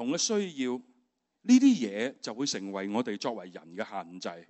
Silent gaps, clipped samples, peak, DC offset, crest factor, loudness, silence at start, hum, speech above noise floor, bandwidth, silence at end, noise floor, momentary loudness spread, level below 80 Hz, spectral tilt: none; under 0.1%; -10 dBFS; under 0.1%; 20 dB; -29 LUFS; 0 s; none; 45 dB; 8.2 kHz; 0.05 s; -74 dBFS; 18 LU; -84 dBFS; -3.5 dB/octave